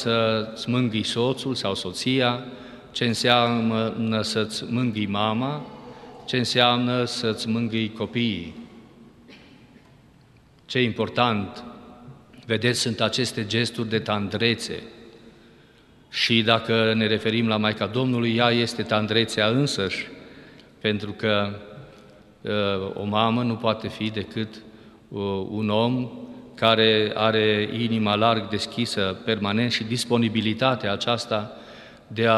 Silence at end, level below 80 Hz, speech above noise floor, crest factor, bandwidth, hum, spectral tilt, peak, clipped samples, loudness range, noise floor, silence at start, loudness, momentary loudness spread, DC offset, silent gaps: 0 s; -60 dBFS; 31 dB; 22 dB; 12.5 kHz; none; -5 dB/octave; -2 dBFS; under 0.1%; 6 LU; -54 dBFS; 0 s; -23 LUFS; 15 LU; under 0.1%; none